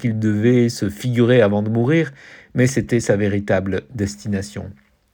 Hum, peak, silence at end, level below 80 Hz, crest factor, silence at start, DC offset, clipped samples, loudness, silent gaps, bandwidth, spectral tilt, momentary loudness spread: none; -2 dBFS; 0.4 s; -50 dBFS; 16 dB; 0 s; under 0.1%; under 0.1%; -19 LUFS; none; 17.5 kHz; -6.5 dB/octave; 11 LU